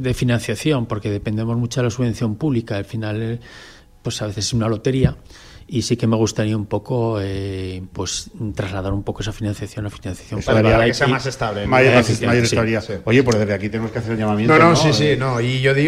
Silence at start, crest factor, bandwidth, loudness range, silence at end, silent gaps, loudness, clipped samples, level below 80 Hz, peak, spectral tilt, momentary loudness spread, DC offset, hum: 0 s; 16 dB; 14 kHz; 7 LU; 0 s; none; -19 LUFS; under 0.1%; -38 dBFS; -2 dBFS; -5.5 dB/octave; 13 LU; under 0.1%; none